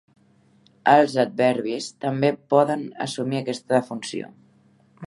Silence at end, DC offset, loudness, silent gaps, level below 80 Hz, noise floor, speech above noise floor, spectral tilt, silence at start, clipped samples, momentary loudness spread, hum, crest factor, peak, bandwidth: 0 s; under 0.1%; -22 LUFS; none; -74 dBFS; -58 dBFS; 37 dB; -5.5 dB/octave; 0.85 s; under 0.1%; 14 LU; none; 22 dB; -2 dBFS; 11.5 kHz